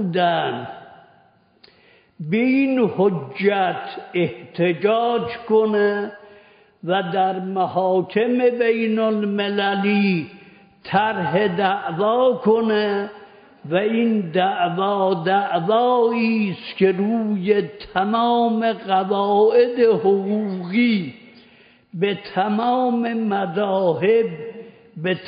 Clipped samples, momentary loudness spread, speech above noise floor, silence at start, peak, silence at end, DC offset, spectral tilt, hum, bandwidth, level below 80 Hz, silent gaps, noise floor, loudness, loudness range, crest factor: under 0.1%; 8 LU; 37 dB; 0 s; -4 dBFS; 0 s; under 0.1%; -4.5 dB/octave; none; 5.2 kHz; -66 dBFS; none; -56 dBFS; -20 LUFS; 3 LU; 16 dB